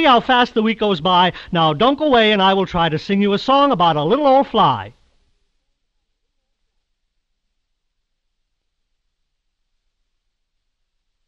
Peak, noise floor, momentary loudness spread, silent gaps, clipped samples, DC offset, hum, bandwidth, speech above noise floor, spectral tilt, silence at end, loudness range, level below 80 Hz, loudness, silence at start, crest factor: -2 dBFS; -72 dBFS; 5 LU; none; under 0.1%; under 0.1%; none; 7.6 kHz; 57 dB; -6.5 dB/octave; 6.4 s; 6 LU; -48 dBFS; -15 LUFS; 0 s; 16 dB